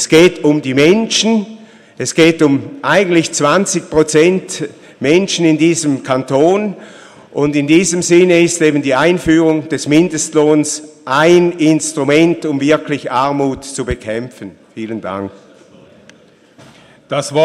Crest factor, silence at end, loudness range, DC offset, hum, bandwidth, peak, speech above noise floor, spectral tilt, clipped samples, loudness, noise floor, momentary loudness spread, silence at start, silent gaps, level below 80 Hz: 14 dB; 0 s; 9 LU; under 0.1%; none; 13.5 kHz; 0 dBFS; 33 dB; -4.5 dB/octave; under 0.1%; -13 LUFS; -45 dBFS; 13 LU; 0 s; none; -44 dBFS